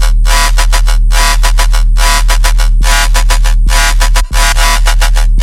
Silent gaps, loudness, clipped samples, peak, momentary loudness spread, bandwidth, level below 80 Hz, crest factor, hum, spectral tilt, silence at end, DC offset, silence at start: none; -10 LUFS; 0.2%; 0 dBFS; 2 LU; 15.5 kHz; -6 dBFS; 6 dB; none; -2 dB/octave; 0 s; under 0.1%; 0 s